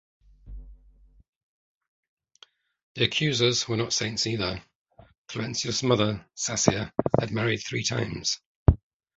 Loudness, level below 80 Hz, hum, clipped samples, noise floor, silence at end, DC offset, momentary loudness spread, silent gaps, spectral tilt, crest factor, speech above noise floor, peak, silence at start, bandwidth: -26 LUFS; -40 dBFS; none; under 0.1%; -58 dBFS; 0.4 s; under 0.1%; 11 LU; 1.28-1.81 s, 1.88-2.17 s, 2.83-2.95 s, 4.75-4.85 s, 5.18-5.24 s, 8.46-8.66 s; -4 dB/octave; 26 dB; 32 dB; -2 dBFS; 0.45 s; 8.2 kHz